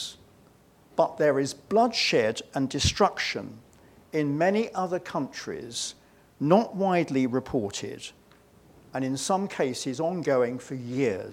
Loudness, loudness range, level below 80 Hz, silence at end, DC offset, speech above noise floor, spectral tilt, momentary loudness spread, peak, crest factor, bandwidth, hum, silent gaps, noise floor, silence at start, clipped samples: -27 LUFS; 4 LU; -54 dBFS; 0 s; under 0.1%; 31 dB; -4.5 dB/octave; 12 LU; -6 dBFS; 22 dB; 16 kHz; none; none; -58 dBFS; 0 s; under 0.1%